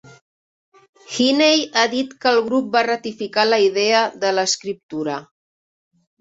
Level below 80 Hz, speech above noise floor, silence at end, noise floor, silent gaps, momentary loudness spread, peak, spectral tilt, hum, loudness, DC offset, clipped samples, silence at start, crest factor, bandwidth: -68 dBFS; over 72 dB; 0.95 s; under -90 dBFS; 4.83-4.89 s; 11 LU; -2 dBFS; -2.5 dB/octave; none; -18 LUFS; under 0.1%; under 0.1%; 1.1 s; 18 dB; 8 kHz